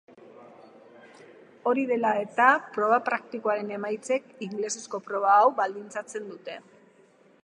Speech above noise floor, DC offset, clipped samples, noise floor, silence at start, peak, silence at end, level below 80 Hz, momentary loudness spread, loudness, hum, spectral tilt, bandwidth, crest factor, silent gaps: 33 dB; under 0.1%; under 0.1%; -59 dBFS; 0.4 s; -6 dBFS; 0.85 s; -86 dBFS; 16 LU; -26 LUFS; none; -3.5 dB/octave; 11 kHz; 22 dB; none